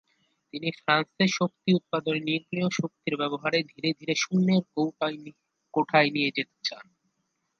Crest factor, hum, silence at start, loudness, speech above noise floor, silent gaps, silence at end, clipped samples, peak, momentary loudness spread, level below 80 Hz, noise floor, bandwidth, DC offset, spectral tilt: 22 dB; none; 0.55 s; -27 LUFS; 50 dB; none; 0.75 s; under 0.1%; -6 dBFS; 10 LU; -76 dBFS; -77 dBFS; 7.2 kHz; under 0.1%; -5 dB/octave